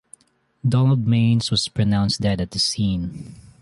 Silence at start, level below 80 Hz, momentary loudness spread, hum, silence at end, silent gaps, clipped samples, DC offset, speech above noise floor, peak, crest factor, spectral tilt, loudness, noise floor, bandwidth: 0.65 s; -42 dBFS; 10 LU; none; 0.25 s; none; under 0.1%; under 0.1%; 40 dB; -8 dBFS; 14 dB; -5.5 dB/octave; -20 LUFS; -60 dBFS; 11.5 kHz